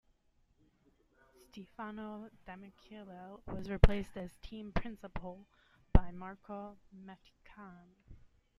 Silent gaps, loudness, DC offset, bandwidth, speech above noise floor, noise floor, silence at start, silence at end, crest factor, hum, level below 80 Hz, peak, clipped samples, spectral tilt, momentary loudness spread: none; -38 LUFS; under 0.1%; 10.5 kHz; 35 dB; -72 dBFS; 1.55 s; 0.45 s; 32 dB; none; -40 dBFS; -6 dBFS; under 0.1%; -8 dB/octave; 24 LU